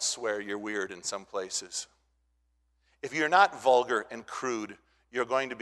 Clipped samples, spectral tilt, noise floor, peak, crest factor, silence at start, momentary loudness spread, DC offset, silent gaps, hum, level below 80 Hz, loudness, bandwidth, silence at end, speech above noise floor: under 0.1%; -2 dB/octave; -73 dBFS; -8 dBFS; 24 dB; 0 s; 15 LU; under 0.1%; none; none; -74 dBFS; -29 LUFS; 12 kHz; 0 s; 43 dB